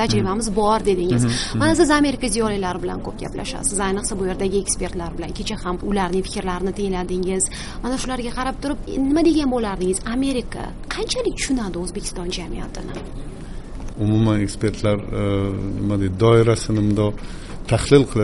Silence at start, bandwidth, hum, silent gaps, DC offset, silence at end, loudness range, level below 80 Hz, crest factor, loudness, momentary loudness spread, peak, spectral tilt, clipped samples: 0 s; 11.5 kHz; none; none; under 0.1%; 0 s; 5 LU; -32 dBFS; 20 dB; -21 LUFS; 14 LU; 0 dBFS; -5 dB/octave; under 0.1%